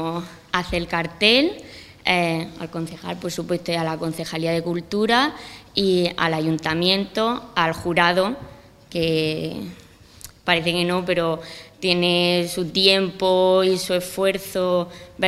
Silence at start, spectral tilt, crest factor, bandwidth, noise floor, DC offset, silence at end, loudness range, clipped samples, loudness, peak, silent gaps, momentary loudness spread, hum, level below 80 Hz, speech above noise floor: 0 s; -4.5 dB/octave; 20 dB; 15.5 kHz; -44 dBFS; under 0.1%; 0 s; 5 LU; under 0.1%; -21 LUFS; 0 dBFS; none; 13 LU; none; -50 dBFS; 23 dB